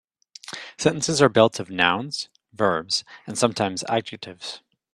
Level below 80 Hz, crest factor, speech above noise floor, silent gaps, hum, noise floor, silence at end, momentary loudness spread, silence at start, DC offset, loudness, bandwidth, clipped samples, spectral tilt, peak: -62 dBFS; 24 dB; 20 dB; none; none; -43 dBFS; 0.35 s; 17 LU; 0.5 s; under 0.1%; -22 LUFS; 13.5 kHz; under 0.1%; -3.5 dB/octave; 0 dBFS